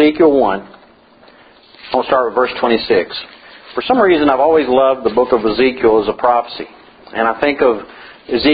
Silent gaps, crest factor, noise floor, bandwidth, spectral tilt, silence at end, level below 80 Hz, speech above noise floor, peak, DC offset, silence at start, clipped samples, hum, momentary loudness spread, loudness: none; 14 dB; -46 dBFS; 5 kHz; -8.5 dB/octave; 0 s; -46 dBFS; 32 dB; 0 dBFS; under 0.1%; 0 s; under 0.1%; none; 15 LU; -14 LUFS